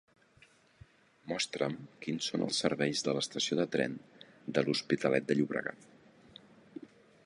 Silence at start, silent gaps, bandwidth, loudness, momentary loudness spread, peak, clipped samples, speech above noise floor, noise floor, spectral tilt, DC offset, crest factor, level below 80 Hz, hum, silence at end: 1.25 s; none; 11.5 kHz; -33 LUFS; 17 LU; -12 dBFS; under 0.1%; 31 dB; -64 dBFS; -4 dB/octave; under 0.1%; 24 dB; -74 dBFS; none; 0.4 s